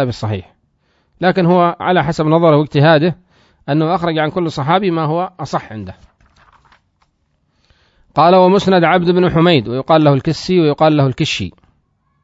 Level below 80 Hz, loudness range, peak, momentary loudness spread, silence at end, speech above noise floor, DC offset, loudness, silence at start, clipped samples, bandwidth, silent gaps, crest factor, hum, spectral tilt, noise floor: -46 dBFS; 8 LU; 0 dBFS; 12 LU; 0.75 s; 50 dB; under 0.1%; -13 LUFS; 0 s; under 0.1%; 7.8 kHz; none; 14 dB; none; -7 dB/octave; -63 dBFS